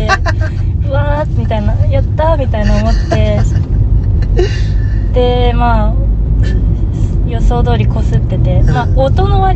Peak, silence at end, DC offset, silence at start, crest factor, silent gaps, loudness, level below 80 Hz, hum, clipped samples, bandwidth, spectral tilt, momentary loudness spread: 0 dBFS; 0 s; under 0.1%; 0 s; 10 dB; none; -13 LUFS; -14 dBFS; none; under 0.1%; 7.6 kHz; -7.5 dB/octave; 4 LU